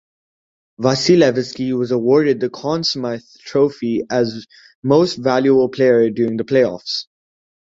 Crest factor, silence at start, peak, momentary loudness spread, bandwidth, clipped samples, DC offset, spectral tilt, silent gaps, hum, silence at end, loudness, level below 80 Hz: 16 dB; 0.8 s; -2 dBFS; 10 LU; 7.8 kHz; under 0.1%; under 0.1%; -5.5 dB/octave; 4.75-4.82 s; none; 0.75 s; -17 LUFS; -58 dBFS